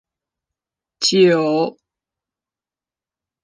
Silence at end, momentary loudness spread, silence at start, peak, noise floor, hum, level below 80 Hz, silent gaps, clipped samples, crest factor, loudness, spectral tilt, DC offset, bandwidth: 1.75 s; 8 LU; 1 s; -2 dBFS; under -90 dBFS; none; -72 dBFS; none; under 0.1%; 18 dB; -16 LUFS; -4 dB/octave; under 0.1%; 10 kHz